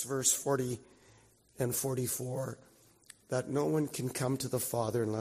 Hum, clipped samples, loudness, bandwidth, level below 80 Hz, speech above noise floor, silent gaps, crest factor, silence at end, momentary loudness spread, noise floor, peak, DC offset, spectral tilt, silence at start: none; under 0.1%; -33 LUFS; 15.5 kHz; -68 dBFS; 30 dB; none; 20 dB; 0 s; 10 LU; -63 dBFS; -14 dBFS; under 0.1%; -4.5 dB/octave; 0 s